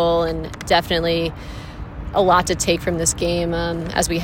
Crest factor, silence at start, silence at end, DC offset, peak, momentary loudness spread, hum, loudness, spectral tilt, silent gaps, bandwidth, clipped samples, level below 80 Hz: 18 dB; 0 s; 0 s; under 0.1%; -2 dBFS; 17 LU; none; -19 LUFS; -4 dB/octave; none; 16.5 kHz; under 0.1%; -34 dBFS